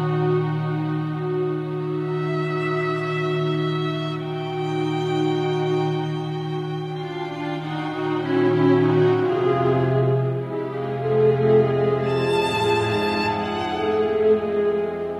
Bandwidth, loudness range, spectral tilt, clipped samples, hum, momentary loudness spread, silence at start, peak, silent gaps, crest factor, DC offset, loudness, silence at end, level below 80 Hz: 12 kHz; 5 LU; -7.5 dB/octave; under 0.1%; none; 9 LU; 0 s; -8 dBFS; none; 14 dB; under 0.1%; -22 LUFS; 0 s; -56 dBFS